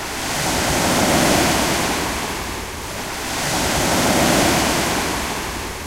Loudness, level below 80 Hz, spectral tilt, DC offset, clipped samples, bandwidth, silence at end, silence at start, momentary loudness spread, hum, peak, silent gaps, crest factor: -18 LUFS; -34 dBFS; -3 dB/octave; under 0.1%; under 0.1%; 16 kHz; 0 s; 0 s; 11 LU; none; -4 dBFS; none; 16 dB